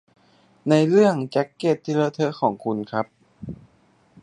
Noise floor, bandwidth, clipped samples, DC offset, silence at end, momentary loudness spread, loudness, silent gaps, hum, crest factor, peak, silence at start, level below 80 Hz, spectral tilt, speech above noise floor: -59 dBFS; 10.5 kHz; under 0.1%; under 0.1%; 0.7 s; 21 LU; -22 LUFS; none; none; 18 dB; -4 dBFS; 0.65 s; -60 dBFS; -7 dB/octave; 39 dB